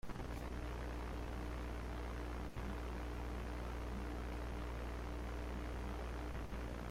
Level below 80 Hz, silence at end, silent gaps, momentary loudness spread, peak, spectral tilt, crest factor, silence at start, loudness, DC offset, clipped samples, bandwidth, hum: -46 dBFS; 0 s; none; 1 LU; -34 dBFS; -6.5 dB/octave; 10 dB; 0.05 s; -46 LUFS; under 0.1%; under 0.1%; 15.5 kHz; none